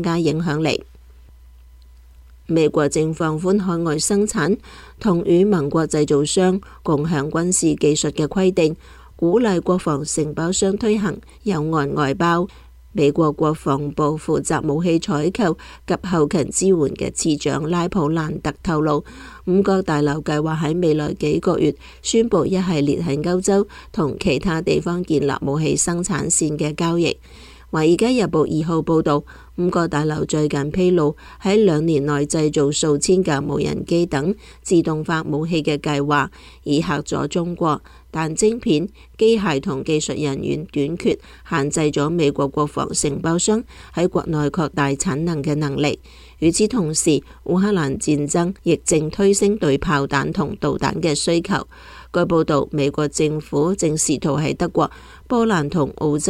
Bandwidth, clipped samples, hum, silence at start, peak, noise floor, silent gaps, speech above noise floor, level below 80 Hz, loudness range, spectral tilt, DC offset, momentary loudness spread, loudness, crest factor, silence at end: 14.5 kHz; under 0.1%; none; 0 s; -6 dBFS; -45 dBFS; none; 26 dB; -42 dBFS; 2 LU; -5 dB/octave; under 0.1%; 6 LU; -19 LUFS; 14 dB; 0 s